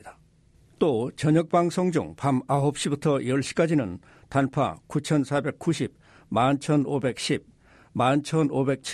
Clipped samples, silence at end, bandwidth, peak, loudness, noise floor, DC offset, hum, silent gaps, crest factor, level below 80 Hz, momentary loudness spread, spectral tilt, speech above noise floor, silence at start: under 0.1%; 0 s; 13 kHz; -10 dBFS; -25 LUFS; -58 dBFS; under 0.1%; none; none; 16 dB; -58 dBFS; 6 LU; -6 dB/octave; 34 dB; 0.05 s